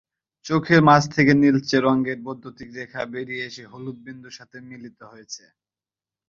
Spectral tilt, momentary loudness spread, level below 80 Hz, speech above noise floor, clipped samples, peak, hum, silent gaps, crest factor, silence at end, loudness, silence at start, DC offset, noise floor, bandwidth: -6 dB/octave; 24 LU; -58 dBFS; over 68 dB; under 0.1%; -2 dBFS; none; none; 22 dB; 0.9 s; -19 LUFS; 0.45 s; under 0.1%; under -90 dBFS; 7.4 kHz